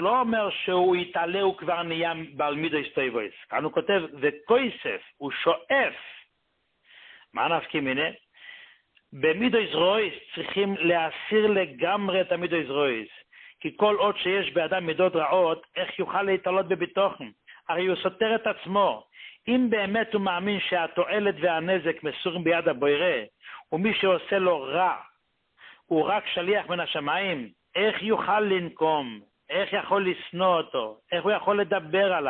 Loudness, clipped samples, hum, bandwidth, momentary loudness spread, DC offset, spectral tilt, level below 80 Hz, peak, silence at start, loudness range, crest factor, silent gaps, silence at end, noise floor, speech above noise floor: -26 LUFS; under 0.1%; none; 4.4 kHz; 9 LU; under 0.1%; -9.5 dB/octave; -68 dBFS; -8 dBFS; 0 s; 3 LU; 18 dB; none; 0 s; -74 dBFS; 48 dB